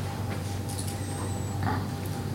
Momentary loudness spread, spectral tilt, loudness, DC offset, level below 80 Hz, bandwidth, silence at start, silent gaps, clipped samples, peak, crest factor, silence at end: 3 LU; -5.5 dB/octave; -32 LUFS; under 0.1%; -50 dBFS; 16.5 kHz; 0 s; none; under 0.1%; -16 dBFS; 16 dB; 0 s